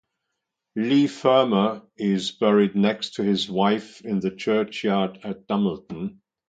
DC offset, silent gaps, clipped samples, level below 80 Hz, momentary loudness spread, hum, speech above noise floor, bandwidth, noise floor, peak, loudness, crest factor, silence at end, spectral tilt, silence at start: under 0.1%; none; under 0.1%; -64 dBFS; 11 LU; none; 59 dB; 9 kHz; -81 dBFS; -4 dBFS; -23 LUFS; 18 dB; 0.35 s; -6.5 dB/octave; 0.75 s